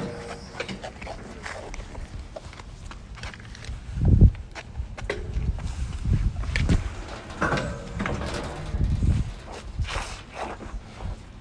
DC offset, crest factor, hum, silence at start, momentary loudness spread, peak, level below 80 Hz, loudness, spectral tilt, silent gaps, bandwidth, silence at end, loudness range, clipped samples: under 0.1%; 22 dB; none; 0 s; 15 LU; -4 dBFS; -30 dBFS; -29 LUFS; -6.5 dB/octave; none; 10.5 kHz; 0 s; 12 LU; under 0.1%